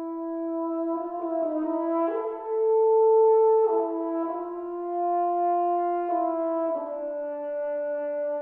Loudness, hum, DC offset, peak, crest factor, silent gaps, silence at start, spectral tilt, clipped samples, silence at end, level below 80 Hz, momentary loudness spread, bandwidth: -26 LUFS; none; under 0.1%; -12 dBFS; 12 dB; none; 0 s; -8.5 dB/octave; under 0.1%; 0 s; -74 dBFS; 12 LU; 3 kHz